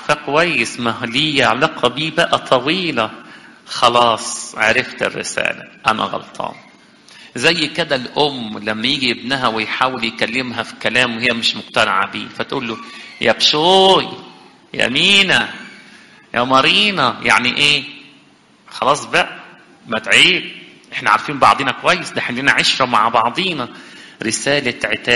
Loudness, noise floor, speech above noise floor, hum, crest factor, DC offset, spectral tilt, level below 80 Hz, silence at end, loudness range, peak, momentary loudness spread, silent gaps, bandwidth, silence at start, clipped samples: -15 LUFS; -49 dBFS; 33 dB; none; 18 dB; under 0.1%; -3 dB/octave; -52 dBFS; 0 s; 5 LU; 0 dBFS; 14 LU; none; 11.5 kHz; 0 s; under 0.1%